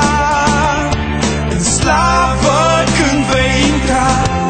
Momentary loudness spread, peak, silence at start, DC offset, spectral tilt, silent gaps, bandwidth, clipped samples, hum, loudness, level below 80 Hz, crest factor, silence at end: 4 LU; 0 dBFS; 0 s; under 0.1%; -4 dB/octave; none; 9.4 kHz; under 0.1%; none; -12 LUFS; -22 dBFS; 12 dB; 0 s